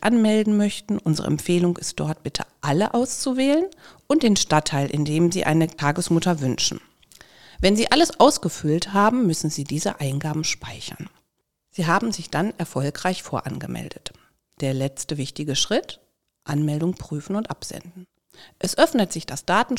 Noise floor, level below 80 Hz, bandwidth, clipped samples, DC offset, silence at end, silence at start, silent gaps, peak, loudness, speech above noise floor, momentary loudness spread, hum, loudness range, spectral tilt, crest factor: -75 dBFS; -50 dBFS; 16.5 kHz; under 0.1%; 0.4%; 0 s; 0 s; none; -2 dBFS; -22 LUFS; 53 dB; 14 LU; none; 6 LU; -4.5 dB/octave; 22 dB